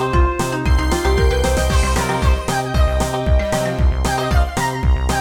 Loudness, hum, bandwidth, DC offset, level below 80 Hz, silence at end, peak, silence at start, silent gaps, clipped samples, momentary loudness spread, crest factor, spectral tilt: -18 LUFS; none; 17 kHz; under 0.1%; -18 dBFS; 0 s; -4 dBFS; 0 s; none; under 0.1%; 3 LU; 12 dB; -5.5 dB/octave